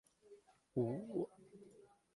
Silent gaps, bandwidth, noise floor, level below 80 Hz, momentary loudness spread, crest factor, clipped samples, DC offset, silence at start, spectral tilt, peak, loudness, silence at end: none; 11.5 kHz; -66 dBFS; -80 dBFS; 24 LU; 20 dB; under 0.1%; under 0.1%; 0.3 s; -9.5 dB/octave; -26 dBFS; -43 LUFS; 0.3 s